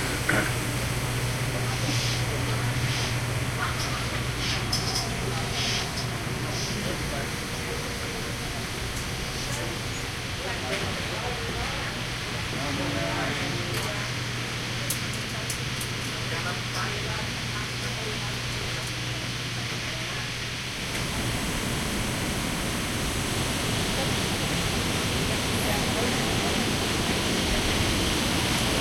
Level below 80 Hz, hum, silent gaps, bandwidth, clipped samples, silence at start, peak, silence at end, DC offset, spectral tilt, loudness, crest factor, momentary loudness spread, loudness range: -40 dBFS; none; none; 16.5 kHz; under 0.1%; 0 s; -8 dBFS; 0 s; under 0.1%; -3.5 dB/octave; -27 LUFS; 20 dB; 6 LU; 5 LU